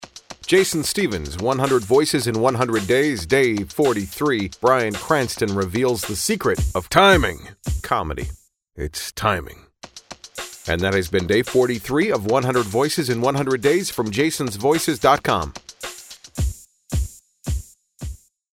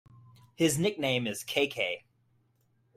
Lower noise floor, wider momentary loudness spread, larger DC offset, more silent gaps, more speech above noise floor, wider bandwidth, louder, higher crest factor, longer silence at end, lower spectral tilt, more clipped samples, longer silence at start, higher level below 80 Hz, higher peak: second, -41 dBFS vs -71 dBFS; first, 16 LU vs 6 LU; neither; neither; second, 22 dB vs 41 dB; first, 18 kHz vs 16 kHz; first, -20 LUFS vs -29 LUFS; about the same, 20 dB vs 22 dB; second, 0.4 s vs 1 s; about the same, -4.5 dB/octave vs -4 dB/octave; neither; second, 0 s vs 0.6 s; first, -36 dBFS vs -68 dBFS; first, 0 dBFS vs -12 dBFS